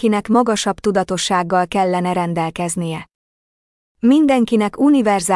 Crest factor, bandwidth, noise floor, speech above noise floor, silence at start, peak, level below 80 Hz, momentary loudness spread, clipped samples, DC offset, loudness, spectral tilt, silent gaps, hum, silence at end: 12 dB; 12 kHz; under -90 dBFS; over 74 dB; 0 s; -4 dBFS; -52 dBFS; 8 LU; under 0.1%; under 0.1%; -17 LUFS; -5 dB/octave; 3.15-3.95 s; none; 0 s